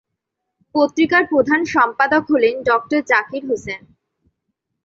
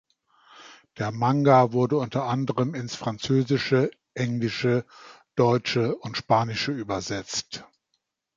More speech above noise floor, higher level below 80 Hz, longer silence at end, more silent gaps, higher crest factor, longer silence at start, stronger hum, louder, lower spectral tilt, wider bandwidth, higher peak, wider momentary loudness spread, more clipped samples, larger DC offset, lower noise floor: first, 61 dB vs 53 dB; about the same, -56 dBFS vs -60 dBFS; first, 1.1 s vs 0.7 s; neither; second, 16 dB vs 22 dB; first, 0.75 s vs 0.55 s; neither; first, -17 LUFS vs -25 LUFS; second, -4.5 dB/octave vs -6 dB/octave; about the same, 7.8 kHz vs 7.6 kHz; about the same, -2 dBFS vs -4 dBFS; about the same, 9 LU vs 11 LU; neither; neither; about the same, -78 dBFS vs -77 dBFS